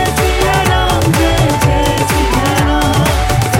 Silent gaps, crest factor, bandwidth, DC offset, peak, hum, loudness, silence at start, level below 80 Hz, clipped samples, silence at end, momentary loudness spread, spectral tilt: none; 10 dB; 17 kHz; under 0.1%; -2 dBFS; none; -12 LUFS; 0 s; -20 dBFS; under 0.1%; 0 s; 1 LU; -5 dB/octave